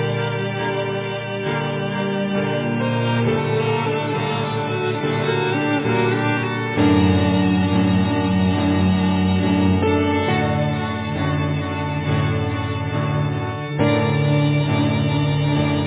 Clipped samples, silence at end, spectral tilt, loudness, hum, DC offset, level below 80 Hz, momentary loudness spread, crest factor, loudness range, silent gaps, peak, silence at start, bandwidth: under 0.1%; 0 s; -11 dB/octave; -20 LUFS; none; under 0.1%; -36 dBFS; 6 LU; 14 dB; 4 LU; none; -4 dBFS; 0 s; 4 kHz